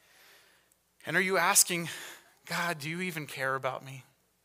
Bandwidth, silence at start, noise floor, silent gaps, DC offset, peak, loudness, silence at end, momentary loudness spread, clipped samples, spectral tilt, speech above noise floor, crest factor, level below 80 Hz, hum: 16 kHz; 1.05 s; -68 dBFS; none; under 0.1%; -8 dBFS; -29 LUFS; 0.45 s; 23 LU; under 0.1%; -2 dB/octave; 37 dB; 24 dB; -80 dBFS; none